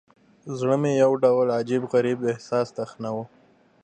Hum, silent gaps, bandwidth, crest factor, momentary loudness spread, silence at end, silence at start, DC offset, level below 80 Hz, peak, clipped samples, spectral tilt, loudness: none; none; 9.2 kHz; 16 dB; 13 LU; 0.6 s; 0.45 s; under 0.1%; -72 dBFS; -8 dBFS; under 0.1%; -7 dB/octave; -23 LUFS